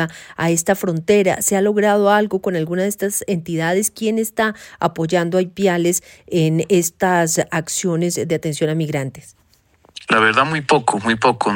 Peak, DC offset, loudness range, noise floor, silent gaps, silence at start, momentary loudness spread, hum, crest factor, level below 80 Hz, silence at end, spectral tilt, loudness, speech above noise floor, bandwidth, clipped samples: -2 dBFS; under 0.1%; 3 LU; -55 dBFS; none; 0 s; 7 LU; none; 16 dB; -56 dBFS; 0 s; -4.5 dB/octave; -18 LUFS; 37 dB; 17 kHz; under 0.1%